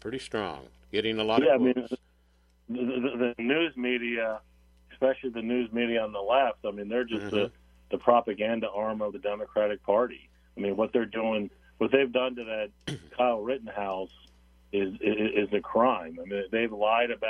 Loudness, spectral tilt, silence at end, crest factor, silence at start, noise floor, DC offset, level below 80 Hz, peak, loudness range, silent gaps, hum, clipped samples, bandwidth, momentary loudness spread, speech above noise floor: -29 LUFS; -6 dB/octave; 0 s; 22 dB; 0.05 s; -64 dBFS; under 0.1%; -60 dBFS; -6 dBFS; 2 LU; none; none; under 0.1%; 11 kHz; 10 LU; 36 dB